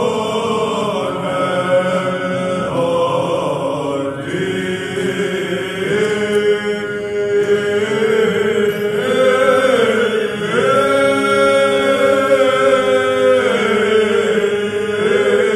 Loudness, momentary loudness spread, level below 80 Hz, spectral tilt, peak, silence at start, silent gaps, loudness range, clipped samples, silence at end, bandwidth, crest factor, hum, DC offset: -15 LUFS; 7 LU; -52 dBFS; -5 dB/octave; 0 dBFS; 0 s; none; 5 LU; under 0.1%; 0 s; 14 kHz; 14 dB; none; under 0.1%